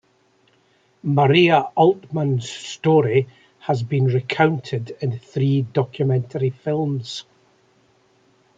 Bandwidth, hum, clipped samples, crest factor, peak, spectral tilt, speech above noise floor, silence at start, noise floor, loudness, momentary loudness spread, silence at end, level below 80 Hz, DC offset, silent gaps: 7.8 kHz; none; under 0.1%; 18 dB; -2 dBFS; -7 dB/octave; 41 dB; 1.05 s; -60 dBFS; -20 LUFS; 12 LU; 1.35 s; -64 dBFS; under 0.1%; none